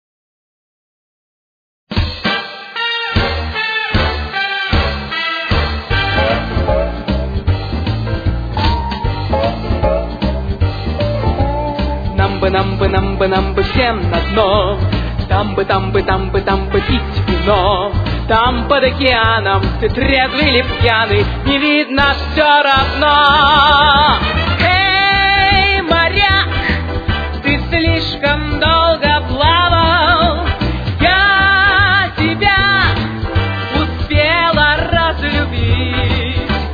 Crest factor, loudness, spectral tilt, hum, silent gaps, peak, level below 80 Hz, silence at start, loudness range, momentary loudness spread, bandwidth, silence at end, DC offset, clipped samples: 14 dB; -13 LUFS; -7 dB/octave; none; none; 0 dBFS; -22 dBFS; 1.9 s; 7 LU; 9 LU; 5 kHz; 0 s; under 0.1%; under 0.1%